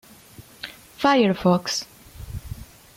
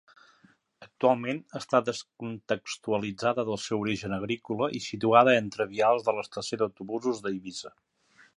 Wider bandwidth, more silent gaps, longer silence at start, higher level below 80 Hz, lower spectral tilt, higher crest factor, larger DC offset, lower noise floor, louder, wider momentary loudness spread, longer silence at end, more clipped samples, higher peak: first, 16.5 kHz vs 11.5 kHz; neither; second, 0.4 s vs 0.8 s; first, -46 dBFS vs -66 dBFS; about the same, -5 dB/octave vs -5 dB/octave; second, 18 dB vs 24 dB; neither; second, -47 dBFS vs -63 dBFS; first, -21 LUFS vs -28 LUFS; first, 22 LU vs 13 LU; second, 0.35 s vs 0.7 s; neither; about the same, -8 dBFS vs -6 dBFS